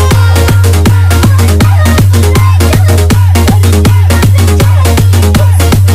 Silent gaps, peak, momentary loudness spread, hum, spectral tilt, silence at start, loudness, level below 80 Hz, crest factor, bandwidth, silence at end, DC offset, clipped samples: none; 0 dBFS; 0 LU; none; -6 dB/octave; 0 s; -6 LUFS; -16 dBFS; 4 dB; 16 kHz; 0 s; under 0.1%; 1%